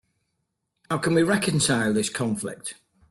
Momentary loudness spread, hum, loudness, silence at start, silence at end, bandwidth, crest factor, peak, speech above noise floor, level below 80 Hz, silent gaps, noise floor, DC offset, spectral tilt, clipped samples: 12 LU; none; -24 LUFS; 0.9 s; 0.35 s; 12.5 kHz; 16 dB; -8 dBFS; 54 dB; -60 dBFS; none; -78 dBFS; under 0.1%; -4.5 dB/octave; under 0.1%